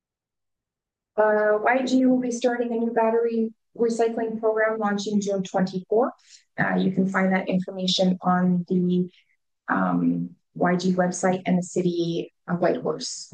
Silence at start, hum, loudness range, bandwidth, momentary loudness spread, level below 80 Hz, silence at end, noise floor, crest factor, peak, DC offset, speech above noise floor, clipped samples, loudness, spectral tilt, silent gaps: 1.15 s; none; 2 LU; 9.4 kHz; 8 LU; -72 dBFS; 0.1 s; -88 dBFS; 16 dB; -8 dBFS; under 0.1%; 65 dB; under 0.1%; -24 LUFS; -6 dB/octave; none